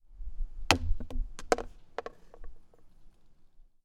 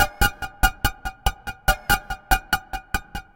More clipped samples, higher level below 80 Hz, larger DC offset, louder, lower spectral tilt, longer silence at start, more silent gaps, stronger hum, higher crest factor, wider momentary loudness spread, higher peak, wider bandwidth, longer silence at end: neither; second, -38 dBFS vs -30 dBFS; neither; second, -33 LUFS vs -24 LUFS; about the same, -3.5 dB/octave vs -2.5 dB/octave; about the same, 0.1 s vs 0 s; neither; neither; first, 32 dB vs 22 dB; first, 21 LU vs 8 LU; about the same, -2 dBFS vs -2 dBFS; about the same, 15.5 kHz vs 17 kHz; about the same, 0.2 s vs 0.15 s